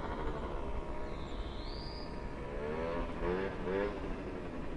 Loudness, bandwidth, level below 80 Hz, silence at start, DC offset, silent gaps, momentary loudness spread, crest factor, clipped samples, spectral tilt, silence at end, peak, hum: -40 LUFS; 10.5 kHz; -44 dBFS; 0 s; under 0.1%; none; 7 LU; 16 dB; under 0.1%; -7 dB/octave; 0 s; -22 dBFS; none